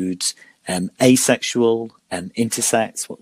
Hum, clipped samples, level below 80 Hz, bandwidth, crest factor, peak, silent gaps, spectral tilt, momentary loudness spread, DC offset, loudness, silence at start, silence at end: none; under 0.1%; -62 dBFS; 15.5 kHz; 18 dB; 0 dBFS; none; -3.5 dB/octave; 13 LU; under 0.1%; -19 LUFS; 0 s; 0.05 s